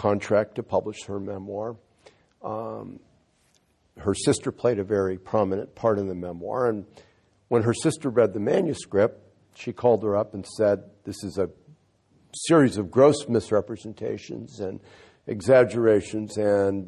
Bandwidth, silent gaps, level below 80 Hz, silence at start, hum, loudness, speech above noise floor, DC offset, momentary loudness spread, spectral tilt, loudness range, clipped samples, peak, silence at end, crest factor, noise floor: 12 kHz; none; -54 dBFS; 0 s; none; -25 LUFS; 41 dB; under 0.1%; 16 LU; -6 dB/octave; 7 LU; under 0.1%; -6 dBFS; 0 s; 20 dB; -65 dBFS